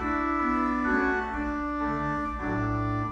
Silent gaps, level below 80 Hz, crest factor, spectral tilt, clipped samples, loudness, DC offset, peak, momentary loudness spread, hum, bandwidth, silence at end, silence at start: none; -42 dBFS; 14 dB; -8 dB/octave; under 0.1%; -28 LUFS; under 0.1%; -12 dBFS; 5 LU; none; 7.8 kHz; 0 s; 0 s